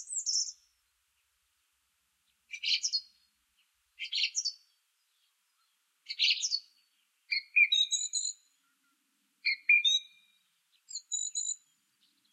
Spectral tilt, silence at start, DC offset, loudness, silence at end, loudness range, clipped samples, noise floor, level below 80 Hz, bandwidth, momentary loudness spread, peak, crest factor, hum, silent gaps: 9 dB/octave; 0 s; under 0.1%; -29 LUFS; 0.75 s; 9 LU; under 0.1%; -77 dBFS; under -90 dBFS; 13.5 kHz; 18 LU; -14 dBFS; 22 dB; none; none